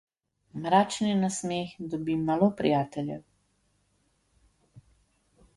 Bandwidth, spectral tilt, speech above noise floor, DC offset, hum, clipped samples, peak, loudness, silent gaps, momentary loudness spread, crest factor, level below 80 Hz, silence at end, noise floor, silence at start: 11.5 kHz; -5.5 dB/octave; 44 dB; under 0.1%; none; under 0.1%; -10 dBFS; -28 LUFS; none; 13 LU; 20 dB; -64 dBFS; 0.8 s; -71 dBFS; 0.55 s